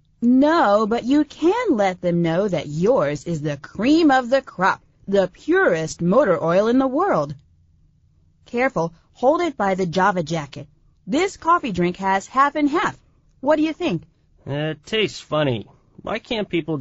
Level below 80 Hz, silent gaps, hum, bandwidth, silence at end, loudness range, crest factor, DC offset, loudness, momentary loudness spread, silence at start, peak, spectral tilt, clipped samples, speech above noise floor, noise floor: -52 dBFS; none; none; 8 kHz; 0 s; 4 LU; 16 dB; under 0.1%; -20 LUFS; 11 LU; 0.2 s; -4 dBFS; -4.5 dB/octave; under 0.1%; 38 dB; -57 dBFS